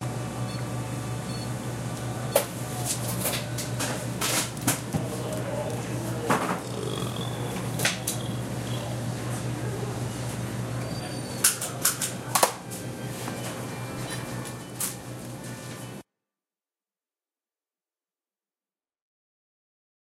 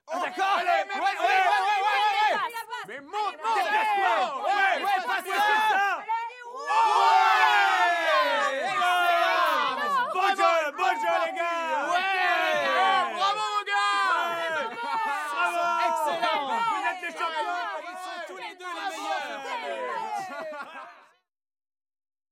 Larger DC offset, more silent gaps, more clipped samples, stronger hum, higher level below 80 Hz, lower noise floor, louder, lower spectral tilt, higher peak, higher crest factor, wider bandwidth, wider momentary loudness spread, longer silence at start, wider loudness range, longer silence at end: neither; neither; neither; neither; first, -52 dBFS vs -90 dBFS; first, under -90 dBFS vs -57 dBFS; second, -29 LUFS vs -25 LUFS; first, -3.5 dB/octave vs -1 dB/octave; first, -4 dBFS vs -8 dBFS; first, 28 dB vs 18 dB; about the same, 16 kHz vs 16 kHz; about the same, 10 LU vs 12 LU; about the same, 0 s vs 0.1 s; about the same, 10 LU vs 10 LU; first, 4.05 s vs 1.4 s